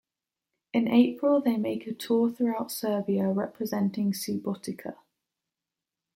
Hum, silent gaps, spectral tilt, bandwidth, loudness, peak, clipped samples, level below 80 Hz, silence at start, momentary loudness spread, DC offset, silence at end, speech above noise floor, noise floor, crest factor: none; none; -6 dB/octave; 16.5 kHz; -27 LUFS; -10 dBFS; under 0.1%; -74 dBFS; 0.75 s; 11 LU; under 0.1%; 1.2 s; 63 dB; -89 dBFS; 20 dB